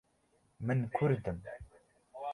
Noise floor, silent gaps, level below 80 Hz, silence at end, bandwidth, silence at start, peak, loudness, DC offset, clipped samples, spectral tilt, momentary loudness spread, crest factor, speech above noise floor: -73 dBFS; none; -60 dBFS; 0 s; 11 kHz; 0.6 s; -18 dBFS; -35 LUFS; under 0.1%; under 0.1%; -9 dB/octave; 19 LU; 18 dB; 39 dB